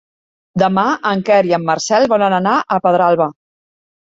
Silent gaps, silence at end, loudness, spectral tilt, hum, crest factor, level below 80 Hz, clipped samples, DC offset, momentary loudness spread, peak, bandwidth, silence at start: none; 0.75 s; -14 LUFS; -5 dB/octave; none; 14 dB; -58 dBFS; under 0.1%; under 0.1%; 4 LU; -2 dBFS; 8 kHz; 0.55 s